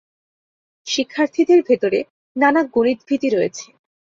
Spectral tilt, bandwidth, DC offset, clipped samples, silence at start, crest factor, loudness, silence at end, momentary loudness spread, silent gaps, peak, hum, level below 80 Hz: -4 dB/octave; 7.6 kHz; under 0.1%; under 0.1%; 0.85 s; 16 dB; -18 LUFS; 0.5 s; 10 LU; 2.10-2.35 s; -2 dBFS; none; -64 dBFS